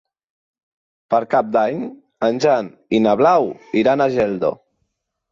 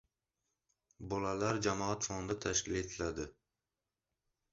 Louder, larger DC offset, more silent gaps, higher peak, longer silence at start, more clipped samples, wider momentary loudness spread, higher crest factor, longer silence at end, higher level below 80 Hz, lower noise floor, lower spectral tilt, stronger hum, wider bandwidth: first, -18 LUFS vs -37 LUFS; neither; neither; first, -4 dBFS vs -18 dBFS; about the same, 1.1 s vs 1 s; neither; about the same, 8 LU vs 9 LU; second, 16 dB vs 22 dB; second, 0.75 s vs 1.2 s; about the same, -60 dBFS vs -58 dBFS; second, -73 dBFS vs under -90 dBFS; first, -6.5 dB/octave vs -4.5 dB/octave; neither; about the same, 7.4 kHz vs 7.6 kHz